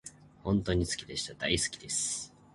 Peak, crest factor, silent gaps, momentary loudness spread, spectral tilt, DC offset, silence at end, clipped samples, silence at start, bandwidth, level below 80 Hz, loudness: -14 dBFS; 20 dB; none; 8 LU; -3.5 dB/octave; under 0.1%; 0.25 s; under 0.1%; 0.05 s; 11.5 kHz; -48 dBFS; -32 LUFS